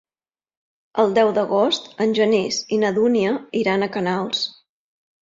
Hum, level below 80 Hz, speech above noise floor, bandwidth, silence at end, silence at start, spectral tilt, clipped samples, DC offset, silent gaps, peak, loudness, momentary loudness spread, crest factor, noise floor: none; -66 dBFS; over 71 dB; 7.8 kHz; 0.75 s; 0.95 s; -4.5 dB/octave; under 0.1%; under 0.1%; none; -4 dBFS; -20 LUFS; 6 LU; 18 dB; under -90 dBFS